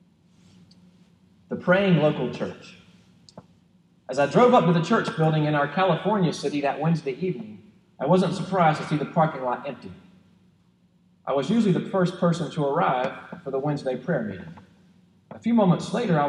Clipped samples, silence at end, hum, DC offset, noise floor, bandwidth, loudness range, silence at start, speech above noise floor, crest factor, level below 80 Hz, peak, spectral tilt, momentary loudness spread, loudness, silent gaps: under 0.1%; 0 s; none; under 0.1%; -61 dBFS; 10.5 kHz; 5 LU; 1.5 s; 38 dB; 20 dB; -68 dBFS; -6 dBFS; -7 dB/octave; 15 LU; -23 LUFS; none